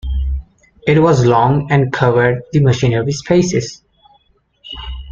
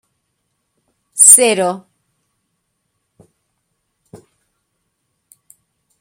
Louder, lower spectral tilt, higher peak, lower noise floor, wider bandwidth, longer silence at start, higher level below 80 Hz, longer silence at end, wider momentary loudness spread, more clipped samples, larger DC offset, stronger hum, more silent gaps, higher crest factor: second, -14 LUFS vs -8 LUFS; first, -6.5 dB/octave vs -1 dB/octave; about the same, 0 dBFS vs 0 dBFS; second, -56 dBFS vs -71 dBFS; second, 7.6 kHz vs 16.5 kHz; second, 0.05 s vs 1.15 s; first, -28 dBFS vs -70 dBFS; second, 0 s vs 4.2 s; second, 17 LU vs 23 LU; second, under 0.1% vs 0.3%; neither; neither; neither; second, 14 dB vs 20 dB